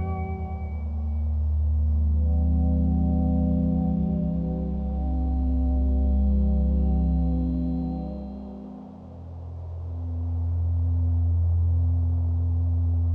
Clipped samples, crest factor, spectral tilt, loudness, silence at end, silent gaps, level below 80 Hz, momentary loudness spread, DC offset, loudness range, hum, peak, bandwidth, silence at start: under 0.1%; 10 dB; -13 dB/octave; -26 LUFS; 0 s; none; -26 dBFS; 13 LU; under 0.1%; 6 LU; none; -14 dBFS; 2.4 kHz; 0 s